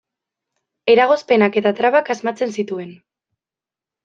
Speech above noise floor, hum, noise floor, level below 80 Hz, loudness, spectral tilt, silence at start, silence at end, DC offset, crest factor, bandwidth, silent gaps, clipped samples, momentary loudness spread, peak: 73 dB; none; -89 dBFS; -68 dBFS; -17 LUFS; -5.5 dB/octave; 0.85 s; 1.1 s; under 0.1%; 18 dB; 7.6 kHz; none; under 0.1%; 12 LU; -2 dBFS